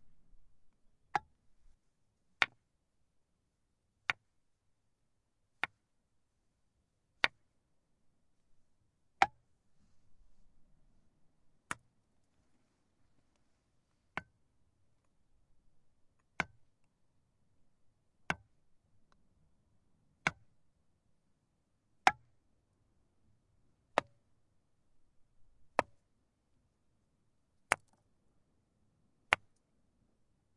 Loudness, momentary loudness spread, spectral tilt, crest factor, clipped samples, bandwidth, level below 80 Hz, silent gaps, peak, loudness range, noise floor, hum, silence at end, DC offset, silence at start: -37 LUFS; 14 LU; -2.5 dB/octave; 38 dB; under 0.1%; 10 kHz; -72 dBFS; none; -6 dBFS; 15 LU; -80 dBFS; none; 1.2 s; under 0.1%; 0.05 s